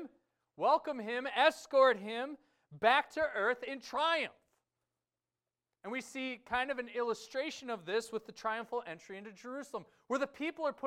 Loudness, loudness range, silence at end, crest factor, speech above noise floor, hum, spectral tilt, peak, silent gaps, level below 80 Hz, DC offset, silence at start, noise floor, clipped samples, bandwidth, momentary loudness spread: -34 LUFS; 8 LU; 0 s; 22 dB; over 55 dB; none; -3 dB/octave; -14 dBFS; none; -74 dBFS; under 0.1%; 0 s; under -90 dBFS; under 0.1%; 14.5 kHz; 16 LU